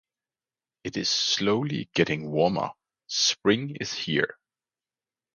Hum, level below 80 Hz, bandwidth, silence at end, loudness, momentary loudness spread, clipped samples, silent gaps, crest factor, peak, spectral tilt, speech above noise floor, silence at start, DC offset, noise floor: none; -62 dBFS; 10 kHz; 1 s; -26 LUFS; 9 LU; under 0.1%; none; 22 dB; -8 dBFS; -3.5 dB/octave; over 64 dB; 0.85 s; under 0.1%; under -90 dBFS